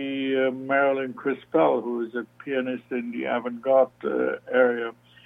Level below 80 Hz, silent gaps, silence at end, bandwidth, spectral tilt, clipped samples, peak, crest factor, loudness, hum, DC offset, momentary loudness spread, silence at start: -72 dBFS; none; 0.35 s; 3.8 kHz; -7.5 dB/octave; under 0.1%; -8 dBFS; 18 dB; -25 LUFS; none; under 0.1%; 9 LU; 0 s